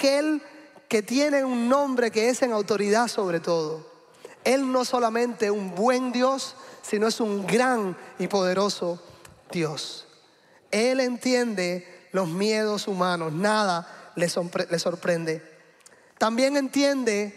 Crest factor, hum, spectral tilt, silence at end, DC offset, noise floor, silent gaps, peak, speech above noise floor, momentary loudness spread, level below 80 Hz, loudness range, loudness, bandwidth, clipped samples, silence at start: 18 dB; none; -4.5 dB/octave; 0 s; under 0.1%; -57 dBFS; none; -8 dBFS; 33 dB; 9 LU; -74 dBFS; 3 LU; -25 LUFS; 15.5 kHz; under 0.1%; 0 s